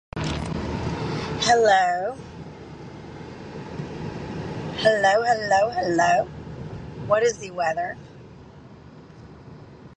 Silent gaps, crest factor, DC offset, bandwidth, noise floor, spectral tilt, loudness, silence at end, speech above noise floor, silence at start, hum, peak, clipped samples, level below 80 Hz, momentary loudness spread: none; 18 dB; under 0.1%; 9.8 kHz; -45 dBFS; -4.5 dB/octave; -23 LUFS; 0 s; 24 dB; 0.15 s; none; -6 dBFS; under 0.1%; -46 dBFS; 21 LU